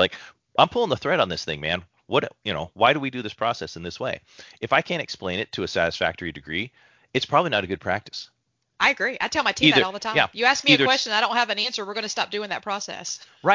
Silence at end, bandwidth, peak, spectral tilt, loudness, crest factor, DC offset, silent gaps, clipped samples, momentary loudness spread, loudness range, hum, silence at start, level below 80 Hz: 0 s; 7.6 kHz; 0 dBFS; -3.5 dB/octave; -23 LUFS; 24 dB; under 0.1%; none; under 0.1%; 13 LU; 6 LU; none; 0 s; -54 dBFS